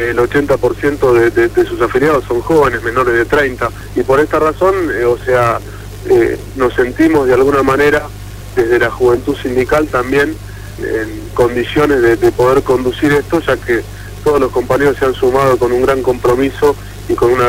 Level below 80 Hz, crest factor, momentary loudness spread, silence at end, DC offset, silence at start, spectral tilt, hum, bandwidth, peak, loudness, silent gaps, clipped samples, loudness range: -32 dBFS; 12 dB; 8 LU; 0 s; 0.6%; 0 s; -6 dB/octave; 50 Hz at -30 dBFS; 16.5 kHz; 0 dBFS; -13 LUFS; none; under 0.1%; 2 LU